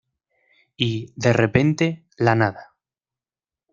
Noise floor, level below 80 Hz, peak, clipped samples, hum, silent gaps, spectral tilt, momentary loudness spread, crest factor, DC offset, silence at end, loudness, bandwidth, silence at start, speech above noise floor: under -90 dBFS; -54 dBFS; -2 dBFS; under 0.1%; none; none; -6.5 dB/octave; 7 LU; 20 dB; under 0.1%; 1.1 s; -21 LUFS; 7.4 kHz; 0.8 s; over 70 dB